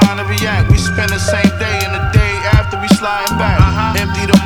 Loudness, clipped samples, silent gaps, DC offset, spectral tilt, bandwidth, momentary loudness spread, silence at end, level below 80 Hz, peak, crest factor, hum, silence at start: -13 LUFS; under 0.1%; none; under 0.1%; -5.5 dB/octave; 19.5 kHz; 4 LU; 0 s; -22 dBFS; 0 dBFS; 12 dB; none; 0 s